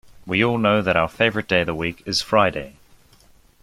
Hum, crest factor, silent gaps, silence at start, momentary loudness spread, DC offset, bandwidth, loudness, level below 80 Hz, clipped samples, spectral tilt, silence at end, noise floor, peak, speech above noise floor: none; 20 dB; none; 0.25 s; 8 LU; under 0.1%; 15.5 kHz; -20 LUFS; -50 dBFS; under 0.1%; -5 dB/octave; 0.9 s; -53 dBFS; -2 dBFS; 33 dB